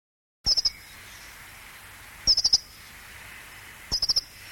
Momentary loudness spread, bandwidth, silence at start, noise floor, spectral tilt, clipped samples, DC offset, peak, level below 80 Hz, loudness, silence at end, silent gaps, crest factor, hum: 23 LU; 17 kHz; 0.45 s; -46 dBFS; 0.5 dB/octave; under 0.1%; under 0.1%; -10 dBFS; -48 dBFS; -23 LUFS; 0 s; none; 20 dB; none